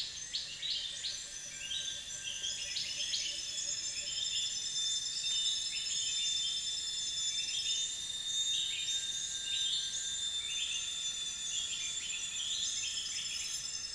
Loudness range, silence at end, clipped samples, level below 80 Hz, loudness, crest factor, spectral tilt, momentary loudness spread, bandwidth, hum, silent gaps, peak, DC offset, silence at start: 3 LU; 0 s; under 0.1%; -66 dBFS; -34 LUFS; 18 dB; 2.5 dB/octave; 5 LU; 10.5 kHz; none; none; -20 dBFS; under 0.1%; 0 s